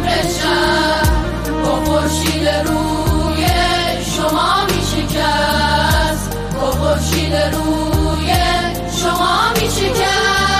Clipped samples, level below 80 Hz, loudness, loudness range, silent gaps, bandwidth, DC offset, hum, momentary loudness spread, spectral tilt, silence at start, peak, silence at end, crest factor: under 0.1%; -24 dBFS; -15 LUFS; 1 LU; none; 16 kHz; under 0.1%; none; 4 LU; -4 dB/octave; 0 s; -4 dBFS; 0 s; 12 dB